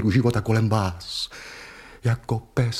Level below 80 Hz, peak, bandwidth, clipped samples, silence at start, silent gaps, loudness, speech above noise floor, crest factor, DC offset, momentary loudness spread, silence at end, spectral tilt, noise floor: -46 dBFS; -8 dBFS; 13.5 kHz; under 0.1%; 0 s; none; -24 LUFS; 20 dB; 16 dB; under 0.1%; 18 LU; 0 s; -6.5 dB/octave; -43 dBFS